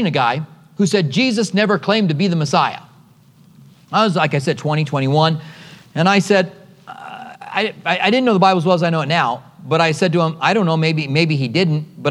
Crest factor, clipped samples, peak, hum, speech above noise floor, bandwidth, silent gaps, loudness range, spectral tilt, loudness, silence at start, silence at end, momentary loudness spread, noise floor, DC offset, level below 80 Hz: 16 dB; under 0.1%; 0 dBFS; none; 32 dB; 11.5 kHz; none; 3 LU; -5.5 dB/octave; -17 LUFS; 0 s; 0 s; 12 LU; -48 dBFS; under 0.1%; -68 dBFS